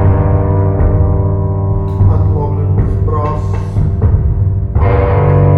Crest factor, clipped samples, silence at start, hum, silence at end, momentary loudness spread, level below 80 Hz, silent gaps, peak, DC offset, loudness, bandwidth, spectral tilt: 10 dB; under 0.1%; 0 s; none; 0 s; 4 LU; -18 dBFS; none; 0 dBFS; under 0.1%; -13 LUFS; 3.1 kHz; -11 dB/octave